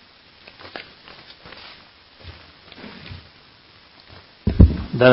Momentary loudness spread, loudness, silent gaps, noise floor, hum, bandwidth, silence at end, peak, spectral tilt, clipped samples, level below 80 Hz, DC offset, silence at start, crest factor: 29 LU; -18 LUFS; none; -50 dBFS; none; 5.8 kHz; 0 s; 0 dBFS; -11.5 dB/octave; under 0.1%; -28 dBFS; under 0.1%; 0.75 s; 22 dB